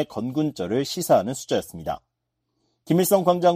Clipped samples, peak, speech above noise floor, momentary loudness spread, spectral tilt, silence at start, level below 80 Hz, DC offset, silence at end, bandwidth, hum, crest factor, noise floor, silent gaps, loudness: under 0.1%; -6 dBFS; 56 dB; 13 LU; -5.5 dB/octave; 0 s; -58 dBFS; under 0.1%; 0 s; 15.5 kHz; none; 18 dB; -78 dBFS; none; -23 LUFS